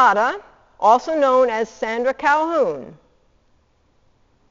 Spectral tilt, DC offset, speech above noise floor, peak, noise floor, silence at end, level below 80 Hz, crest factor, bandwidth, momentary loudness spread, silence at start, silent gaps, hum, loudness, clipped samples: -1.5 dB/octave; under 0.1%; 42 dB; -2 dBFS; -60 dBFS; 1.55 s; -58 dBFS; 18 dB; 7.6 kHz; 8 LU; 0 s; none; none; -18 LUFS; under 0.1%